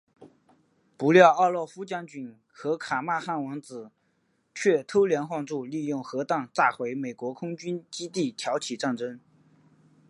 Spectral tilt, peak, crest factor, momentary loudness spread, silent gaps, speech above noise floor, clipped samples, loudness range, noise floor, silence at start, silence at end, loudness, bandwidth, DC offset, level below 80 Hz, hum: -5 dB/octave; -2 dBFS; 24 dB; 15 LU; none; 45 dB; under 0.1%; 6 LU; -71 dBFS; 0.2 s; 0.9 s; -26 LUFS; 11.5 kHz; under 0.1%; -78 dBFS; none